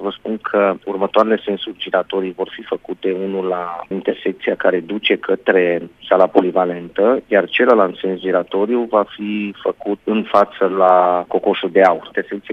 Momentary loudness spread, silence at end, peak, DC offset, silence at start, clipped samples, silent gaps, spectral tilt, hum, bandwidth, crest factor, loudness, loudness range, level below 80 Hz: 10 LU; 0 s; 0 dBFS; under 0.1%; 0 s; under 0.1%; none; -7 dB/octave; none; 6.2 kHz; 16 dB; -17 LUFS; 5 LU; -60 dBFS